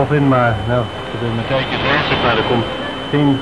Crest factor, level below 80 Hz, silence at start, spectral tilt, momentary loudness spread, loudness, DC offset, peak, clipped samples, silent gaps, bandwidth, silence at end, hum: 14 dB; -36 dBFS; 0 s; -7 dB/octave; 8 LU; -16 LUFS; 0.8%; -2 dBFS; under 0.1%; none; 11 kHz; 0 s; none